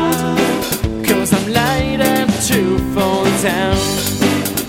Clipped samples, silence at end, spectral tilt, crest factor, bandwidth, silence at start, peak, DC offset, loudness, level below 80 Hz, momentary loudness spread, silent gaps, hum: under 0.1%; 0 s; -4.5 dB/octave; 16 dB; 17 kHz; 0 s; 0 dBFS; under 0.1%; -15 LUFS; -32 dBFS; 2 LU; none; none